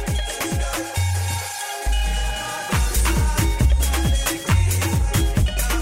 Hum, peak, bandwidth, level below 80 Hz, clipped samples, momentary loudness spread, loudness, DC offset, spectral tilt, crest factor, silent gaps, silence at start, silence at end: none; -8 dBFS; 16.5 kHz; -22 dBFS; under 0.1%; 6 LU; -22 LUFS; under 0.1%; -4 dB/octave; 12 dB; none; 0 s; 0 s